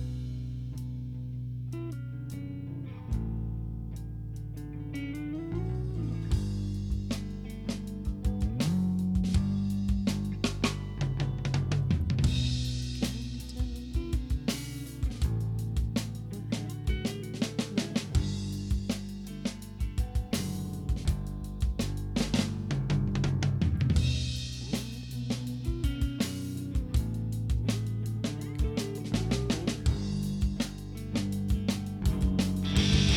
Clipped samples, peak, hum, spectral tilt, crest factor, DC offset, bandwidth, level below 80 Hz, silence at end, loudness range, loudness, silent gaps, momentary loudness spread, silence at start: under 0.1%; -14 dBFS; none; -6 dB/octave; 16 dB; under 0.1%; 17 kHz; -36 dBFS; 0 s; 6 LU; -32 LUFS; none; 9 LU; 0 s